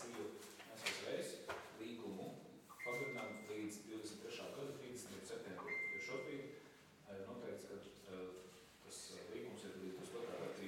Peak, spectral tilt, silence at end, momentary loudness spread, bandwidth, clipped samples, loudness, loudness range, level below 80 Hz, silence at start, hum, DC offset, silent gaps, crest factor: -26 dBFS; -3.5 dB/octave; 0 s; 11 LU; 18 kHz; under 0.1%; -49 LUFS; 5 LU; -84 dBFS; 0 s; none; under 0.1%; none; 24 dB